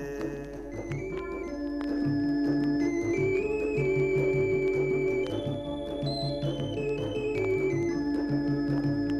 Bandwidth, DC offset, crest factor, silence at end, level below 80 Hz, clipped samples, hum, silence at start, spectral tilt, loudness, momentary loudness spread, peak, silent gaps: 11 kHz; under 0.1%; 12 dB; 0 s; -48 dBFS; under 0.1%; none; 0 s; -7.5 dB/octave; -29 LUFS; 9 LU; -16 dBFS; none